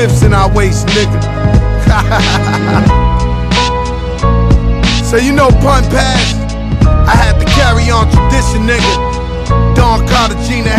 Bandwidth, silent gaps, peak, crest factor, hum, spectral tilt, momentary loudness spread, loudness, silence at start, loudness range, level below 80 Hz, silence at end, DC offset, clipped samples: 14 kHz; none; 0 dBFS; 8 dB; none; -5.5 dB/octave; 5 LU; -10 LUFS; 0 s; 2 LU; -14 dBFS; 0 s; under 0.1%; 0.6%